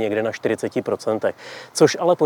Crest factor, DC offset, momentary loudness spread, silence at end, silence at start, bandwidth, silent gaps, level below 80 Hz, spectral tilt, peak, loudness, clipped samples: 18 dB; under 0.1%; 10 LU; 0 s; 0 s; 18.5 kHz; none; -72 dBFS; -4.5 dB/octave; -2 dBFS; -21 LUFS; under 0.1%